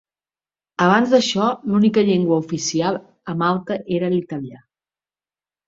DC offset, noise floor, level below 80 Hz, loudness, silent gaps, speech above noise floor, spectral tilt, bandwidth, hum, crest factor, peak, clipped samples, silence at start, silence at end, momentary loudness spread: under 0.1%; under -90 dBFS; -62 dBFS; -19 LUFS; none; over 72 dB; -5.5 dB/octave; 7.8 kHz; none; 18 dB; -2 dBFS; under 0.1%; 0.8 s; 1.1 s; 13 LU